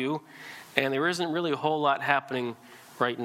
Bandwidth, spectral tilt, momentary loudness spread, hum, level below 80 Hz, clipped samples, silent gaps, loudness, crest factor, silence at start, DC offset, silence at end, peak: 16.5 kHz; -5 dB/octave; 13 LU; none; -78 dBFS; under 0.1%; none; -28 LUFS; 24 dB; 0 s; under 0.1%; 0 s; -4 dBFS